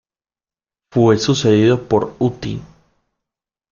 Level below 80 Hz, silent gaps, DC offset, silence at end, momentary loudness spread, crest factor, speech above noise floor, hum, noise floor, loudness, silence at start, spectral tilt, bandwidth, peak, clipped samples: -50 dBFS; none; under 0.1%; 1.05 s; 14 LU; 16 dB; over 75 dB; none; under -90 dBFS; -16 LUFS; 0.95 s; -6 dB/octave; 7.4 kHz; -2 dBFS; under 0.1%